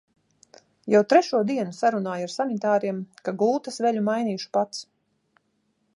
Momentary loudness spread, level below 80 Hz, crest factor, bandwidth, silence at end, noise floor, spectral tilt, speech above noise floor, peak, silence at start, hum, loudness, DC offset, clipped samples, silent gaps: 12 LU; -78 dBFS; 20 dB; 11.5 kHz; 1.15 s; -71 dBFS; -5.5 dB/octave; 48 dB; -6 dBFS; 0.85 s; none; -24 LUFS; under 0.1%; under 0.1%; none